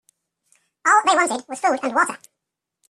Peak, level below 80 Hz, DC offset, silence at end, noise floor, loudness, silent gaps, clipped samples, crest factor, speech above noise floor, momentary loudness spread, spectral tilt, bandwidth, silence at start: -4 dBFS; -74 dBFS; under 0.1%; 0.75 s; -82 dBFS; -19 LUFS; none; under 0.1%; 18 dB; 62 dB; 8 LU; -1 dB/octave; 14 kHz; 0.85 s